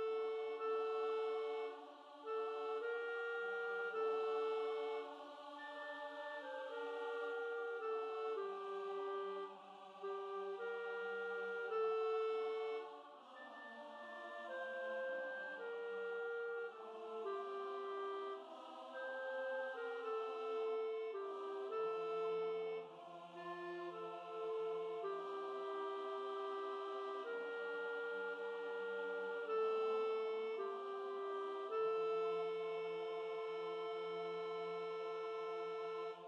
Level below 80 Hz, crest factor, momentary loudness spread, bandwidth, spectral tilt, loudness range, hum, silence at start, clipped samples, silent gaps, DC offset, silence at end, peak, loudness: under -90 dBFS; 12 dB; 9 LU; 7.4 kHz; -4.5 dB/octave; 4 LU; none; 0 s; under 0.1%; none; under 0.1%; 0 s; -32 dBFS; -44 LUFS